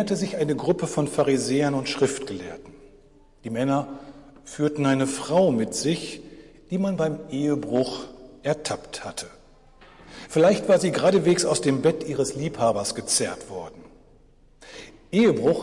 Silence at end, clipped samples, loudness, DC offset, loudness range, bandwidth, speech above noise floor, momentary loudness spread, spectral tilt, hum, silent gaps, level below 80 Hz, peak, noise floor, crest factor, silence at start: 0 s; under 0.1%; -24 LUFS; under 0.1%; 6 LU; 11.5 kHz; 31 dB; 21 LU; -5 dB/octave; none; none; -54 dBFS; -10 dBFS; -54 dBFS; 16 dB; 0 s